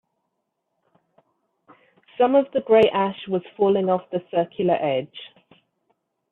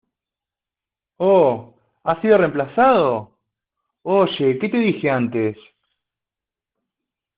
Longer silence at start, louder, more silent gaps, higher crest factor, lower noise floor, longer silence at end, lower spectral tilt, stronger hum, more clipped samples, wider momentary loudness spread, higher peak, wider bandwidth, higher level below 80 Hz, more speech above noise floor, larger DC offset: first, 2.2 s vs 1.2 s; second, -21 LUFS vs -18 LUFS; neither; about the same, 18 dB vs 18 dB; second, -77 dBFS vs -89 dBFS; second, 1.05 s vs 1.85 s; first, -8.5 dB/octave vs -5 dB/octave; neither; neither; about the same, 11 LU vs 11 LU; about the same, -6 dBFS vs -4 dBFS; second, 4.5 kHz vs 5 kHz; second, -68 dBFS vs -62 dBFS; second, 56 dB vs 72 dB; neither